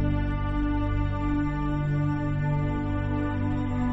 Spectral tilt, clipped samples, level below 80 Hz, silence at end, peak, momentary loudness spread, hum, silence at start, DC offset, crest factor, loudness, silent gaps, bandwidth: -9.5 dB/octave; under 0.1%; -32 dBFS; 0 s; -14 dBFS; 2 LU; 50 Hz at -45 dBFS; 0 s; under 0.1%; 12 dB; -28 LUFS; none; 7.6 kHz